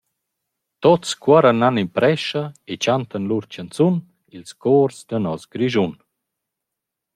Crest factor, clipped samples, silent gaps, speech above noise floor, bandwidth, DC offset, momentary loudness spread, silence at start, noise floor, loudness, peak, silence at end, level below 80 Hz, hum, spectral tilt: 18 dB; under 0.1%; none; 64 dB; 12.5 kHz; under 0.1%; 11 LU; 0.8 s; -83 dBFS; -19 LUFS; -2 dBFS; 1.2 s; -64 dBFS; none; -6 dB/octave